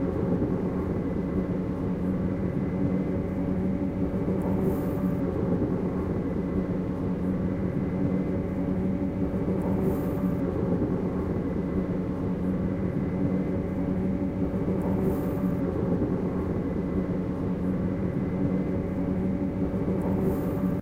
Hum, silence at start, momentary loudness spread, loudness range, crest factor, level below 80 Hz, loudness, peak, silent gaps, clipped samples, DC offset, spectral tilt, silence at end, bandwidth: none; 0 s; 2 LU; 1 LU; 14 dB; -40 dBFS; -28 LUFS; -14 dBFS; none; under 0.1%; under 0.1%; -10 dB/octave; 0 s; 16 kHz